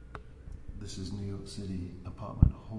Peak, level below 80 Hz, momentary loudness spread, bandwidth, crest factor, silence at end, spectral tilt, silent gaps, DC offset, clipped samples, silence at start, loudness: -6 dBFS; -38 dBFS; 21 LU; 11 kHz; 28 dB; 0 s; -7.5 dB/octave; none; under 0.1%; under 0.1%; 0 s; -35 LUFS